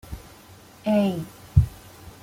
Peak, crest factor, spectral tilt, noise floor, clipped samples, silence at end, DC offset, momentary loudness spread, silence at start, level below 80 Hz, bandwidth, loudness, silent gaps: -2 dBFS; 22 dB; -8 dB/octave; -48 dBFS; under 0.1%; 0.15 s; under 0.1%; 21 LU; 0.1 s; -36 dBFS; 16.5 kHz; -24 LUFS; none